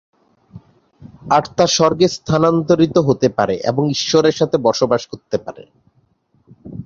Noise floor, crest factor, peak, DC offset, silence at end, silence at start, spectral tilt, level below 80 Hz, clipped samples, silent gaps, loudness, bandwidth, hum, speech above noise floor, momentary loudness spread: -59 dBFS; 16 dB; 0 dBFS; under 0.1%; 0.05 s; 0.55 s; -5 dB/octave; -50 dBFS; under 0.1%; none; -16 LUFS; 7.6 kHz; none; 44 dB; 11 LU